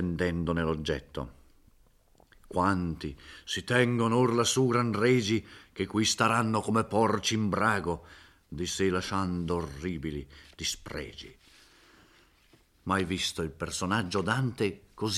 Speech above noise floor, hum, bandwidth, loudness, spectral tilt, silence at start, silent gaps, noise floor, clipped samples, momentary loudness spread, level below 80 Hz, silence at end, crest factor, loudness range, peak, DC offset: 34 dB; none; 15 kHz; -29 LUFS; -4.5 dB/octave; 0 s; none; -63 dBFS; under 0.1%; 15 LU; -54 dBFS; 0 s; 20 dB; 9 LU; -10 dBFS; under 0.1%